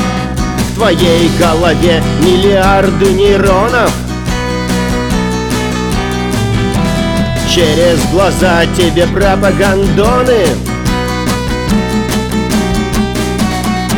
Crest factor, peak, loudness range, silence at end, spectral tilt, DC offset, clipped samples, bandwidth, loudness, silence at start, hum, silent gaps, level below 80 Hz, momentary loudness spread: 10 dB; 0 dBFS; 4 LU; 0 s; -5 dB/octave; under 0.1%; under 0.1%; over 20 kHz; -11 LUFS; 0 s; none; none; -22 dBFS; 6 LU